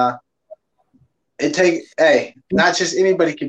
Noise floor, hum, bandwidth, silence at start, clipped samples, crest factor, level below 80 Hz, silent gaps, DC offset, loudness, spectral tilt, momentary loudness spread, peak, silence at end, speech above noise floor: -59 dBFS; none; 8.6 kHz; 0 s; under 0.1%; 16 dB; -58 dBFS; none; under 0.1%; -17 LUFS; -4 dB/octave; 7 LU; -2 dBFS; 0 s; 43 dB